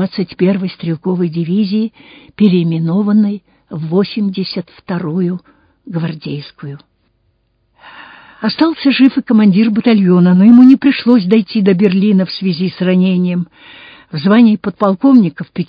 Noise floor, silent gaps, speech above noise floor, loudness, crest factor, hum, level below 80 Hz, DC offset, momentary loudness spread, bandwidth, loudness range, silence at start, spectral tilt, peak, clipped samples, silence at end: -60 dBFS; none; 48 dB; -12 LUFS; 12 dB; none; -58 dBFS; under 0.1%; 15 LU; 5.2 kHz; 13 LU; 0 s; -10 dB/octave; 0 dBFS; 0.5%; 0.05 s